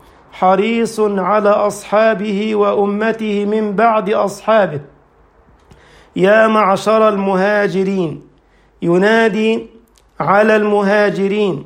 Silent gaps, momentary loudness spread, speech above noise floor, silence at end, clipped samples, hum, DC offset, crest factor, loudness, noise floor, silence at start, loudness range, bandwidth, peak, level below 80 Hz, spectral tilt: none; 7 LU; 37 dB; 0 s; under 0.1%; none; under 0.1%; 14 dB; -14 LUFS; -51 dBFS; 0.35 s; 2 LU; 15.5 kHz; 0 dBFS; -54 dBFS; -6 dB/octave